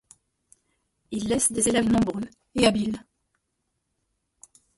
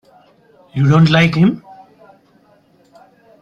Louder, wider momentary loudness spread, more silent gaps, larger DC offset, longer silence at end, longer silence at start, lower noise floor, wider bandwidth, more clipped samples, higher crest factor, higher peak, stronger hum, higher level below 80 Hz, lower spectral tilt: second, -24 LUFS vs -12 LUFS; about the same, 14 LU vs 16 LU; neither; neither; about the same, 1.8 s vs 1.85 s; first, 1.1 s vs 0.75 s; first, -78 dBFS vs -52 dBFS; first, 12 kHz vs 7.4 kHz; neither; about the same, 20 dB vs 16 dB; second, -6 dBFS vs -2 dBFS; neither; about the same, -52 dBFS vs -50 dBFS; second, -3.5 dB/octave vs -7.5 dB/octave